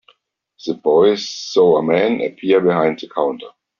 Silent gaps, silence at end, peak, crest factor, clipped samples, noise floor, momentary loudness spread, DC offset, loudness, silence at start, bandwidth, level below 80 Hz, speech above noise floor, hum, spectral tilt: none; 0.3 s; -2 dBFS; 14 dB; under 0.1%; -60 dBFS; 9 LU; under 0.1%; -16 LUFS; 0.65 s; 7.2 kHz; -60 dBFS; 45 dB; none; -4 dB/octave